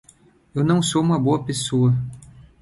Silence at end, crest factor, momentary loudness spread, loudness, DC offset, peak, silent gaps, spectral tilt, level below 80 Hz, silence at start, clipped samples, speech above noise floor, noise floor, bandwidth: 0.35 s; 16 dB; 8 LU; -20 LUFS; under 0.1%; -6 dBFS; none; -6 dB/octave; -52 dBFS; 0.55 s; under 0.1%; 35 dB; -54 dBFS; 11.5 kHz